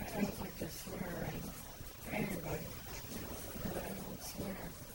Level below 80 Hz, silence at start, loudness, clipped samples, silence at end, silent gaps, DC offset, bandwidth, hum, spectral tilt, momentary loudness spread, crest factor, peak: -54 dBFS; 0 s; -43 LUFS; under 0.1%; 0 s; none; under 0.1%; 16.5 kHz; none; -5 dB/octave; 7 LU; 20 dB; -22 dBFS